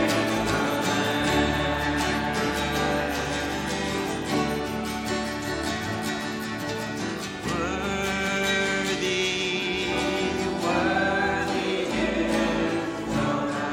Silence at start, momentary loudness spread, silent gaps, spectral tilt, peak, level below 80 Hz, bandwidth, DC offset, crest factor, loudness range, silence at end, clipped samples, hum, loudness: 0 s; 6 LU; none; -4 dB/octave; -10 dBFS; -44 dBFS; 17 kHz; under 0.1%; 16 dB; 4 LU; 0 s; under 0.1%; none; -26 LUFS